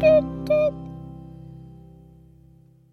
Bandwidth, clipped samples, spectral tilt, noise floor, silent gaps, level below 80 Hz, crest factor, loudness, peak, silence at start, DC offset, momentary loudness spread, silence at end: 6.2 kHz; under 0.1%; -8 dB/octave; -53 dBFS; none; -48 dBFS; 18 dB; -21 LUFS; -6 dBFS; 0 s; under 0.1%; 24 LU; 1.35 s